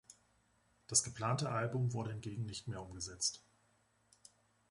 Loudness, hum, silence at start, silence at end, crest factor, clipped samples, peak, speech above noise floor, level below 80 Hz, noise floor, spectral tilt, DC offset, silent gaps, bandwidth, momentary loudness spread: -38 LUFS; none; 0.1 s; 1.3 s; 24 dB; under 0.1%; -18 dBFS; 36 dB; -66 dBFS; -75 dBFS; -3.5 dB/octave; under 0.1%; none; 11.5 kHz; 12 LU